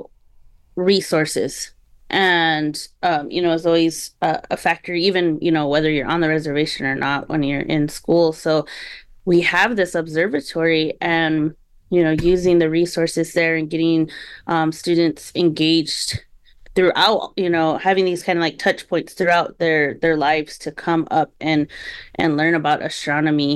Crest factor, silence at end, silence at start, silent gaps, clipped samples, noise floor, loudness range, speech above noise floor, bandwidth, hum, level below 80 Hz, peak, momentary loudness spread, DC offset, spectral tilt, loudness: 14 dB; 0 s; 0 s; none; under 0.1%; -49 dBFS; 2 LU; 30 dB; 12.5 kHz; none; -46 dBFS; -4 dBFS; 7 LU; under 0.1%; -5 dB/octave; -19 LUFS